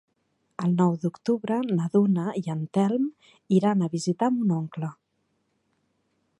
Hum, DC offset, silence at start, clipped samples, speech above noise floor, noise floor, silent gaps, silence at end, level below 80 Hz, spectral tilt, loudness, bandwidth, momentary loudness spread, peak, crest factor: none; under 0.1%; 0.6 s; under 0.1%; 49 dB; -73 dBFS; none; 1.45 s; -74 dBFS; -8 dB/octave; -25 LUFS; 11 kHz; 9 LU; -8 dBFS; 18 dB